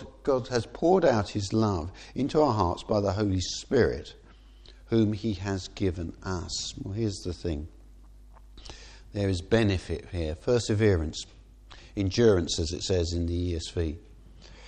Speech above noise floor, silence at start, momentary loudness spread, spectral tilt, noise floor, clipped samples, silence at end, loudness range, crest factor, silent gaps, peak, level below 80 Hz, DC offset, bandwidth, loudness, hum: 24 dB; 0 s; 14 LU; -6 dB/octave; -51 dBFS; under 0.1%; 0 s; 7 LU; 20 dB; none; -8 dBFS; -44 dBFS; under 0.1%; 9.8 kHz; -28 LUFS; none